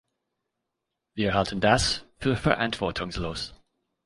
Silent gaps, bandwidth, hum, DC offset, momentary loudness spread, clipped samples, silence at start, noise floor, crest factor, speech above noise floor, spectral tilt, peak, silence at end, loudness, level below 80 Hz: none; 11.5 kHz; none; under 0.1%; 12 LU; under 0.1%; 1.15 s; -83 dBFS; 22 dB; 58 dB; -4.5 dB/octave; -6 dBFS; 0.5 s; -26 LUFS; -44 dBFS